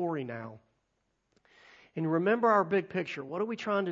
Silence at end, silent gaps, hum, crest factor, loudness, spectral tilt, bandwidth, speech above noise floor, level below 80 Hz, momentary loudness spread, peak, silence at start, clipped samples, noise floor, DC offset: 0 s; none; none; 20 dB; -30 LUFS; -7.5 dB/octave; 7.6 kHz; 48 dB; -78 dBFS; 16 LU; -12 dBFS; 0 s; under 0.1%; -78 dBFS; under 0.1%